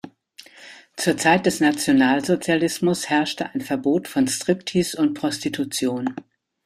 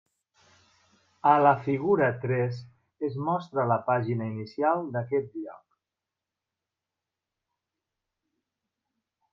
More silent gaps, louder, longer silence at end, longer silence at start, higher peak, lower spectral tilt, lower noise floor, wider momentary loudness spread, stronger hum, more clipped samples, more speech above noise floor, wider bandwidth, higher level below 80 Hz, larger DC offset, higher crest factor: neither; first, -21 LUFS vs -27 LUFS; second, 0.45 s vs 3.75 s; second, 0.05 s vs 1.25 s; about the same, -4 dBFS vs -6 dBFS; second, -4.5 dB/octave vs -9 dB/octave; second, -48 dBFS vs -88 dBFS; second, 9 LU vs 14 LU; neither; neither; second, 27 dB vs 62 dB; first, 15 kHz vs 7 kHz; first, -60 dBFS vs -72 dBFS; neither; about the same, 18 dB vs 22 dB